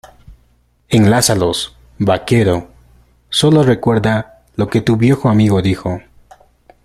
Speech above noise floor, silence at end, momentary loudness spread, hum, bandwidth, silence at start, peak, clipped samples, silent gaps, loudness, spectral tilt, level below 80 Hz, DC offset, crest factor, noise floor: 42 dB; 0.85 s; 10 LU; none; 15 kHz; 0.3 s; 0 dBFS; under 0.1%; none; -14 LUFS; -5.5 dB/octave; -42 dBFS; under 0.1%; 14 dB; -55 dBFS